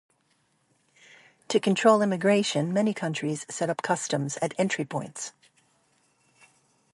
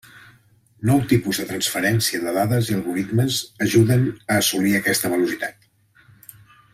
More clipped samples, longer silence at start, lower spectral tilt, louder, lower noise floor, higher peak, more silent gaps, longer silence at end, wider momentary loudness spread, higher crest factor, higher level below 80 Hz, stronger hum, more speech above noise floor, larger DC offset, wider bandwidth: neither; first, 1.5 s vs 0.15 s; about the same, -4.5 dB/octave vs -4.5 dB/octave; second, -26 LUFS vs -20 LUFS; first, -70 dBFS vs -56 dBFS; about the same, -6 dBFS vs -4 dBFS; neither; first, 1.65 s vs 1.25 s; first, 12 LU vs 6 LU; about the same, 22 dB vs 18 dB; second, -76 dBFS vs -54 dBFS; neither; first, 44 dB vs 36 dB; neither; second, 11.5 kHz vs 16 kHz